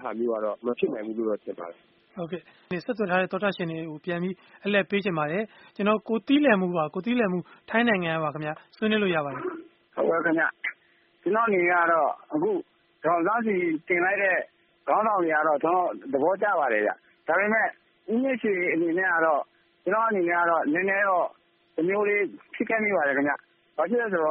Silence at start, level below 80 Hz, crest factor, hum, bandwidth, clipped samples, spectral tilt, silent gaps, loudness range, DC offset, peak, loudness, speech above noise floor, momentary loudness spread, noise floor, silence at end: 0 s; -72 dBFS; 18 dB; none; 5 kHz; under 0.1%; -4 dB/octave; none; 4 LU; under 0.1%; -8 dBFS; -26 LUFS; 34 dB; 12 LU; -60 dBFS; 0 s